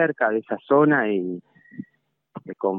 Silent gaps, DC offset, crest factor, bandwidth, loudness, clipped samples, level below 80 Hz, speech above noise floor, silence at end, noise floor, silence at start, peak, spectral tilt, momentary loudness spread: none; under 0.1%; 18 dB; 3.8 kHz; -21 LUFS; under 0.1%; -78 dBFS; 48 dB; 0 s; -69 dBFS; 0 s; -6 dBFS; -11 dB/octave; 23 LU